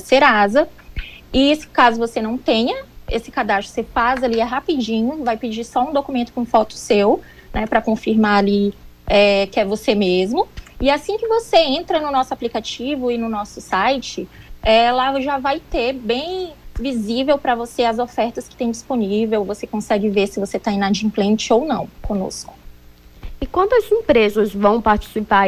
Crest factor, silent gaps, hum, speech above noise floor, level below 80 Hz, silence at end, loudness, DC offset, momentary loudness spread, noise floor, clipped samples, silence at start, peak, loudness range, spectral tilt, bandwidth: 16 dB; none; 60 Hz at -50 dBFS; 26 dB; -38 dBFS; 0 s; -18 LUFS; under 0.1%; 10 LU; -44 dBFS; under 0.1%; 0 s; -2 dBFS; 3 LU; -5 dB/octave; 15.5 kHz